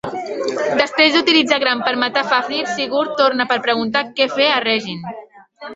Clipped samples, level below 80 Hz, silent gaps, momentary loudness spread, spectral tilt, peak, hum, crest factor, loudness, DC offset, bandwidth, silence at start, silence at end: under 0.1%; -62 dBFS; none; 12 LU; -3.5 dB/octave; 0 dBFS; none; 16 dB; -16 LUFS; under 0.1%; 8 kHz; 0.05 s; 0 s